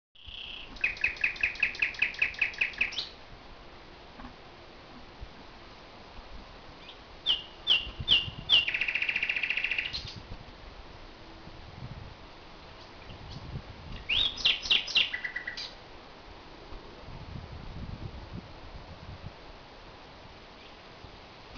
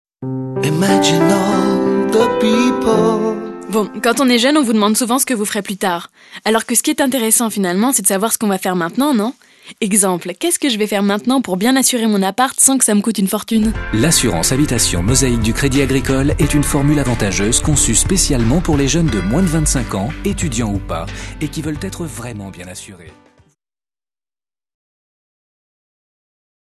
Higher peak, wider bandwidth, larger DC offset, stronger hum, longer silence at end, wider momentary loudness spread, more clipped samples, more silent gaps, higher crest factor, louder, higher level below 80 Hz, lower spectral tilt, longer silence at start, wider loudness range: second, -10 dBFS vs 0 dBFS; second, 5.4 kHz vs 13 kHz; neither; neither; second, 0 s vs 3.65 s; first, 24 LU vs 11 LU; neither; neither; first, 24 dB vs 16 dB; second, -27 LUFS vs -15 LUFS; second, -50 dBFS vs -30 dBFS; second, -2.5 dB/octave vs -4 dB/octave; about the same, 0.15 s vs 0.2 s; first, 20 LU vs 9 LU